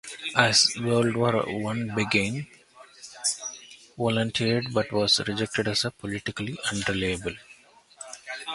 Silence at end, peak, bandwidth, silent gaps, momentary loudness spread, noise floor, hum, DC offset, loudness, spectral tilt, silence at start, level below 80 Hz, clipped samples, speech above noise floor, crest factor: 0 s; -2 dBFS; 11.5 kHz; none; 19 LU; -54 dBFS; none; under 0.1%; -25 LUFS; -3.5 dB/octave; 0.05 s; -54 dBFS; under 0.1%; 28 dB; 26 dB